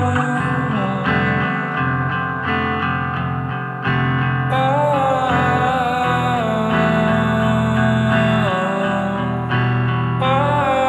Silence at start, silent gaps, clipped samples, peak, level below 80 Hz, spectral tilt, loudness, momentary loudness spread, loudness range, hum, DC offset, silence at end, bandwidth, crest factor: 0 s; none; under 0.1%; -2 dBFS; -42 dBFS; -7 dB/octave; -18 LUFS; 5 LU; 3 LU; none; under 0.1%; 0 s; 12 kHz; 16 dB